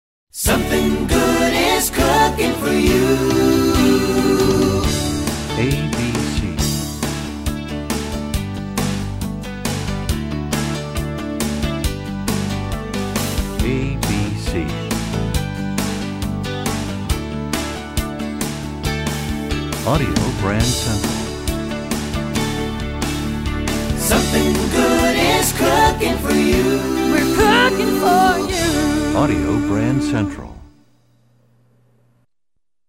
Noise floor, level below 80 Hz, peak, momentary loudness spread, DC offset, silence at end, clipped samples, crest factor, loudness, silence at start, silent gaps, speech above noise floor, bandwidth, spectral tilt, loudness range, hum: -77 dBFS; -30 dBFS; -4 dBFS; 9 LU; under 0.1%; 2.2 s; under 0.1%; 16 dB; -18 LUFS; 0.35 s; none; 61 dB; 16.5 kHz; -4.5 dB/octave; 8 LU; none